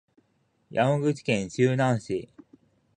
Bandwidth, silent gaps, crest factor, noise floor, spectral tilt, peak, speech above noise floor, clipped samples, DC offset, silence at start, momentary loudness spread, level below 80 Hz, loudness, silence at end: 9.8 kHz; none; 20 dB; -70 dBFS; -6.5 dB/octave; -8 dBFS; 45 dB; under 0.1%; under 0.1%; 0.7 s; 10 LU; -62 dBFS; -26 LUFS; 0.7 s